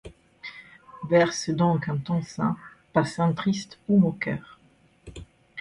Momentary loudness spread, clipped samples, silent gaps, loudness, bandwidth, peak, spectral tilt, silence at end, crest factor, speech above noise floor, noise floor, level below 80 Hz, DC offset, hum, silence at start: 22 LU; under 0.1%; none; -25 LUFS; 11 kHz; -8 dBFS; -6.5 dB/octave; 0 s; 18 dB; 36 dB; -60 dBFS; -56 dBFS; under 0.1%; none; 0.05 s